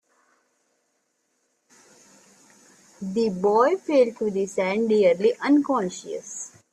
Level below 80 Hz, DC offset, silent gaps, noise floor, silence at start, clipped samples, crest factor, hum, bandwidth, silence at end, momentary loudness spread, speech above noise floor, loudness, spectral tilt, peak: -70 dBFS; under 0.1%; none; -72 dBFS; 3 s; under 0.1%; 18 dB; none; 11.5 kHz; 0.25 s; 14 LU; 50 dB; -22 LUFS; -5.5 dB/octave; -8 dBFS